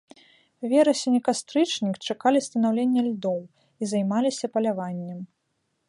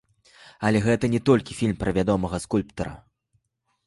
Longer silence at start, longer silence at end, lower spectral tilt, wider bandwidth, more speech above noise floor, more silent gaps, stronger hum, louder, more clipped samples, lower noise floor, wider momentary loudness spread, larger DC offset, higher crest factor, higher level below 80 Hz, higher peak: about the same, 0.6 s vs 0.6 s; second, 0.65 s vs 0.9 s; second, -5 dB/octave vs -6.5 dB/octave; about the same, 11.5 kHz vs 11.5 kHz; about the same, 51 dB vs 51 dB; neither; neither; about the same, -24 LUFS vs -24 LUFS; neither; about the same, -75 dBFS vs -73 dBFS; first, 13 LU vs 9 LU; neither; about the same, 18 dB vs 18 dB; second, -76 dBFS vs -46 dBFS; about the same, -8 dBFS vs -6 dBFS